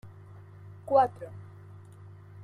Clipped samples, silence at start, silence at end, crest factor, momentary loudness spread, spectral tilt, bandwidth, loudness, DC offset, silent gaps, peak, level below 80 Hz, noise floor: under 0.1%; 0.05 s; 0 s; 22 dB; 25 LU; -8 dB/octave; 10.5 kHz; -26 LUFS; under 0.1%; none; -12 dBFS; -68 dBFS; -49 dBFS